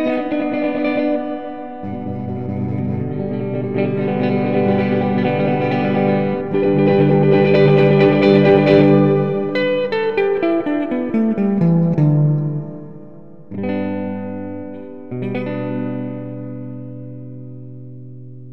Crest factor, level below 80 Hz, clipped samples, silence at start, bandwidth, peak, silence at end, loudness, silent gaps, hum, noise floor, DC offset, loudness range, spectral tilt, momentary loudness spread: 16 dB; -52 dBFS; under 0.1%; 0 s; 5.8 kHz; 0 dBFS; 0 s; -17 LUFS; none; none; -40 dBFS; 1%; 13 LU; -10 dB/octave; 20 LU